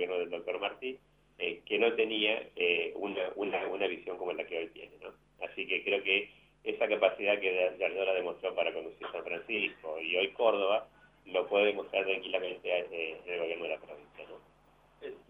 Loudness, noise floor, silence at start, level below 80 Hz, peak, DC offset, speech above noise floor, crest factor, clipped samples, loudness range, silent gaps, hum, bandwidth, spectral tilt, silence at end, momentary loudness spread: -33 LUFS; -65 dBFS; 0 s; -72 dBFS; -12 dBFS; under 0.1%; 31 dB; 22 dB; under 0.1%; 4 LU; none; none; 5.4 kHz; -5.5 dB/octave; 0.1 s; 15 LU